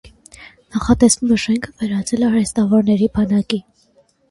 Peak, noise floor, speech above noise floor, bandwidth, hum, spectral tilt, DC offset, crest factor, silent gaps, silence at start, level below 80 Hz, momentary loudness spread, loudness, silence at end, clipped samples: 0 dBFS; -56 dBFS; 40 dB; 11.5 kHz; none; -5 dB/octave; under 0.1%; 16 dB; none; 0.05 s; -40 dBFS; 10 LU; -17 LUFS; 0.7 s; under 0.1%